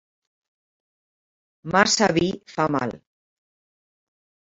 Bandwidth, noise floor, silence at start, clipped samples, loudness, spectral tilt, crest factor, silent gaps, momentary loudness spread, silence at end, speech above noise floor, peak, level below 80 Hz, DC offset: 7.8 kHz; under -90 dBFS; 1.65 s; under 0.1%; -21 LUFS; -3.5 dB/octave; 26 dB; none; 12 LU; 1.6 s; over 69 dB; 0 dBFS; -58 dBFS; under 0.1%